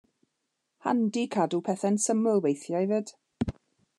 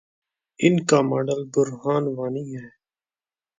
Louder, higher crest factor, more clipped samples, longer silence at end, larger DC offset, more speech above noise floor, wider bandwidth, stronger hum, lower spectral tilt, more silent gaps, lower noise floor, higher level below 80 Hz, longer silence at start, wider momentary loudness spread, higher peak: second, -28 LUFS vs -22 LUFS; about the same, 16 dB vs 20 dB; neither; second, 0.5 s vs 0.9 s; neither; second, 54 dB vs over 68 dB; first, 12 kHz vs 9.6 kHz; neither; about the same, -5.5 dB/octave vs -6 dB/octave; neither; second, -81 dBFS vs under -90 dBFS; first, -56 dBFS vs -68 dBFS; first, 0.85 s vs 0.6 s; about the same, 10 LU vs 12 LU; second, -12 dBFS vs -4 dBFS